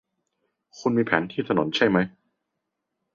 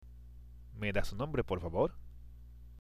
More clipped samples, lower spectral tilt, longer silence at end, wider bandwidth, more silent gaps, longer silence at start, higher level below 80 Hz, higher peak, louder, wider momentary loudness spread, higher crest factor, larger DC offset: neither; about the same, -6 dB/octave vs -6.5 dB/octave; first, 1.05 s vs 0 s; second, 7.4 kHz vs 14.5 kHz; neither; first, 0.75 s vs 0 s; second, -62 dBFS vs -48 dBFS; first, -4 dBFS vs -18 dBFS; first, -24 LUFS vs -36 LUFS; second, 6 LU vs 21 LU; about the same, 22 dB vs 20 dB; neither